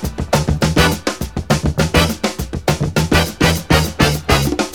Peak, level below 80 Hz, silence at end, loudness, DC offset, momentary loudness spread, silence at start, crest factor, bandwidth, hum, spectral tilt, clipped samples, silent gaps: 0 dBFS; -26 dBFS; 0 s; -16 LUFS; 0.6%; 7 LU; 0 s; 16 dB; 19 kHz; none; -4.5 dB/octave; under 0.1%; none